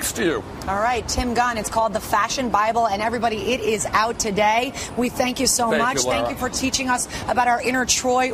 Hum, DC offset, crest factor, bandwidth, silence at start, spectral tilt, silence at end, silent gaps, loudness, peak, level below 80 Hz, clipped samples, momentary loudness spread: none; under 0.1%; 18 dB; 15 kHz; 0 s; -2.5 dB/octave; 0 s; none; -21 LUFS; -4 dBFS; -40 dBFS; under 0.1%; 5 LU